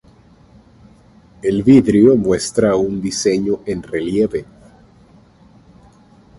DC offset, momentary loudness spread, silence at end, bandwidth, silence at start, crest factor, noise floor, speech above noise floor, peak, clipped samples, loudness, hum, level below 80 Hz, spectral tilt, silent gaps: under 0.1%; 11 LU; 1.95 s; 11.5 kHz; 1.45 s; 18 dB; -48 dBFS; 33 dB; 0 dBFS; under 0.1%; -15 LUFS; none; -46 dBFS; -6 dB/octave; none